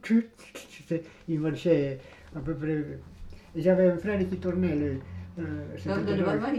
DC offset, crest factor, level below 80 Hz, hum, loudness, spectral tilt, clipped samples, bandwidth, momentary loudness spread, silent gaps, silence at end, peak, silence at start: under 0.1%; 18 dB; -52 dBFS; none; -29 LUFS; -8 dB/octave; under 0.1%; 12.5 kHz; 17 LU; none; 0 s; -10 dBFS; 0.05 s